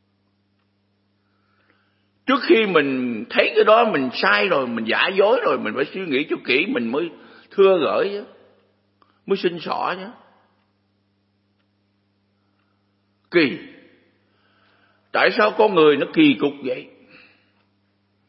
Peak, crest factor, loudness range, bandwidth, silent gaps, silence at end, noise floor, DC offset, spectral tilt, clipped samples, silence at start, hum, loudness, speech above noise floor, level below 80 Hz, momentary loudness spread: 0 dBFS; 22 dB; 11 LU; 5.8 kHz; none; 1.45 s; -66 dBFS; under 0.1%; -9.5 dB/octave; under 0.1%; 2.25 s; none; -19 LUFS; 48 dB; -76 dBFS; 11 LU